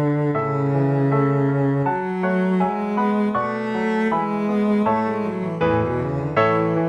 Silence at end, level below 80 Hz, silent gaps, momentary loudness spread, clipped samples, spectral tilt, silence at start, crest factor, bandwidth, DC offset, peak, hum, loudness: 0 s; -50 dBFS; none; 4 LU; under 0.1%; -9 dB/octave; 0 s; 14 dB; 8.2 kHz; under 0.1%; -6 dBFS; none; -21 LUFS